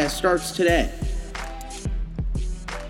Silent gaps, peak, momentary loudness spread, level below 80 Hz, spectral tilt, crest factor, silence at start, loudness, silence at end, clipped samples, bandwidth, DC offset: none; -6 dBFS; 13 LU; -30 dBFS; -4.5 dB/octave; 18 dB; 0 s; -25 LUFS; 0 s; under 0.1%; 16.5 kHz; under 0.1%